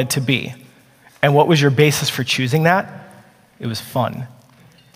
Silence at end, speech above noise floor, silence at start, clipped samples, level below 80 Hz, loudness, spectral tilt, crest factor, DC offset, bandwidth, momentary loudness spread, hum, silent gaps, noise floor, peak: 0.7 s; 33 dB; 0 s; under 0.1%; -58 dBFS; -17 LUFS; -5 dB/octave; 18 dB; under 0.1%; 16 kHz; 18 LU; none; none; -50 dBFS; 0 dBFS